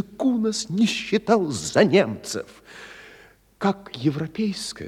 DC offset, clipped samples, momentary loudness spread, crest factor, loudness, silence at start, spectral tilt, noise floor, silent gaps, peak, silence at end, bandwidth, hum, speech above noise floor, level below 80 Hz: under 0.1%; under 0.1%; 22 LU; 20 dB; -23 LUFS; 0 s; -5 dB/octave; -52 dBFS; none; -4 dBFS; 0 s; 14 kHz; none; 29 dB; -60 dBFS